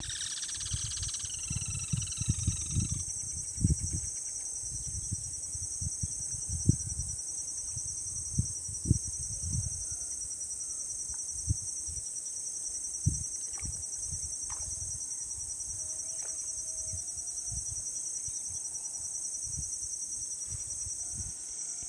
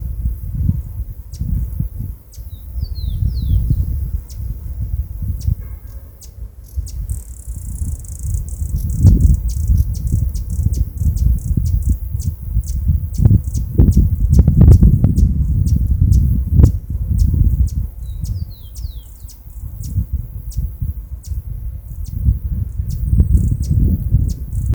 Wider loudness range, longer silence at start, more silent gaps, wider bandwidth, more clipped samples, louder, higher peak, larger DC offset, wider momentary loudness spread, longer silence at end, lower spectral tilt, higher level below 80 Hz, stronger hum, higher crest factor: second, 2 LU vs 13 LU; about the same, 0 s vs 0 s; neither; second, 11 kHz vs over 20 kHz; second, under 0.1% vs 0.1%; second, -34 LUFS vs -18 LUFS; second, -10 dBFS vs 0 dBFS; neither; second, 4 LU vs 17 LU; about the same, 0 s vs 0 s; second, -2.5 dB/octave vs -8.5 dB/octave; second, -46 dBFS vs -18 dBFS; neither; first, 26 dB vs 16 dB